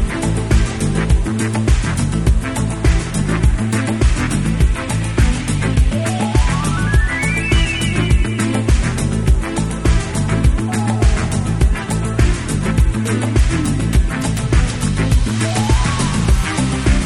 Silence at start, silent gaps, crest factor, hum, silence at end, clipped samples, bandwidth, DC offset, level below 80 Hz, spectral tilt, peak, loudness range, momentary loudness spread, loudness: 0 s; none; 14 dB; none; 0 s; under 0.1%; 12.5 kHz; under 0.1%; -18 dBFS; -5.5 dB/octave; -2 dBFS; 1 LU; 3 LU; -17 LUFS